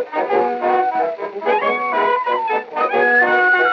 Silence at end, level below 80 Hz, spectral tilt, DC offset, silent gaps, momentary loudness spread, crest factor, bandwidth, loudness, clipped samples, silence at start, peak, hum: 0 s; -80 dBFS; -5 dB/octave; under 0.1%; none; 8 LU; 12 dB; 6.6 kHz; -17 LUFS; under 0.1%; 0 s; -4 dBFS; none